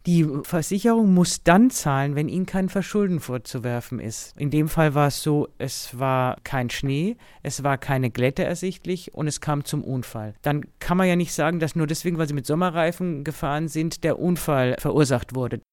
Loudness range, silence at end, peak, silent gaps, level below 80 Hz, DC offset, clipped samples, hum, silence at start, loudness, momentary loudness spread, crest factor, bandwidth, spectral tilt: 5 LU; 0.15 s; -2 dBFS; none; -46 dBFS; under 0.1%; under 0.1%; none; 0.05 s; -23 LUFS; 10 LU; 20 dB; 18.5 kHz; -6 dB/octave